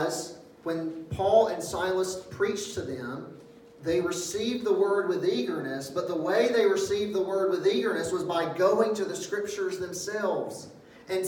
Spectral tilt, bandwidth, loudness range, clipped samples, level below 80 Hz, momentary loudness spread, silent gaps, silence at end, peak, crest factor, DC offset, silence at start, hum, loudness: -4 dB/octave; 17.5 kHz; 3 LU; under 0.1%; -62 dBFS; 12 LU; none; 0 s; -10 dBFS; 18 dB; under 0.1%; 0 s; none; -28 LUFS